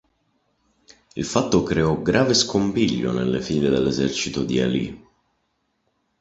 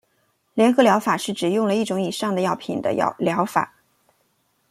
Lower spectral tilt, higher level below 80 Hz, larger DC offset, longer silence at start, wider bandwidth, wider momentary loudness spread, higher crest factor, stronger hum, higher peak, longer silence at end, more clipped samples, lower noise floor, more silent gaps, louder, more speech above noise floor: about the same, -5 dB/octave vs -5 dB/octave; first, -46 dBFS vs -66 dBFS; neither; first, 1.15 s vs 0.55 s; second, 8.2 kHz vs 15.5 kHz; about the same, 7 LU vs 8 LU; about the same, 20 dB vs 20 dB; neither; about the same, -2 dBFS vs -2 dBFS; first, 1.25 s vs 1.05 s; neither; first, -71 dBFS vs -67 dBFS; neither; about the same, -21 LUFS vs -21 LUFS; first, 51 dB vs 47 dB